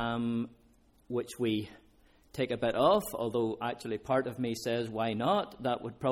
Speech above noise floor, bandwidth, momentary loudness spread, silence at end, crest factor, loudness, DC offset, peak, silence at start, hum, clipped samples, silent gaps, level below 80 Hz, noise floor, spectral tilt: 31 dB; 17 kHz; 10 LU; 0 s; 20 dB; -32 LUFS; under 0.1%; -12 dBFS; 0 s; none; under 0.1%; none; -62 dBFS; -63 dBFS; -5.5 dB/octave